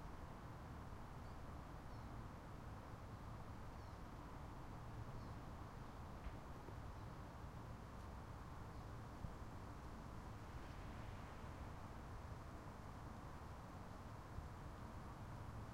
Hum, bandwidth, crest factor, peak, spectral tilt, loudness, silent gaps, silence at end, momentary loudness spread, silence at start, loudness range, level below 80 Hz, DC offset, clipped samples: none; 16 kHz; 18 dB; -36 dBFS; -6.5 dB/octave; -55 LUFS; none; 0 s; 2 LU; 0 s; 1 LU; -58 dBFS; under 0.1%; under 0.1%